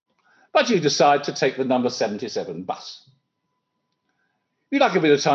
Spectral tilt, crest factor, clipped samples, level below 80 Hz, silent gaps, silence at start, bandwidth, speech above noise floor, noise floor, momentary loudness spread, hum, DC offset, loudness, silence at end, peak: -4 dB/octave; 18 dB; under 0.1%; -74 dBFS; none; 0.55 s; 7.8 kHz; 56 dB; -76 dBFS; 14 LU; none; under 0.1%; -21 LUFS; 0 s; -4 dBFS